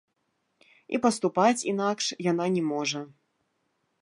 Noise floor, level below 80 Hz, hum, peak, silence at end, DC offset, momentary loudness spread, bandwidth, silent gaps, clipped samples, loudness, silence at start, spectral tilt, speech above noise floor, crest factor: -76 dBFS; -76 dBFS; none; -8 dBFS; 0.95 s; under 0.1%; 9 LU; 11.5 kHz; none; under 0.1%; -27 LUFS; 0.9 s; -4.5 dB/octave; 50 dB; 20 dB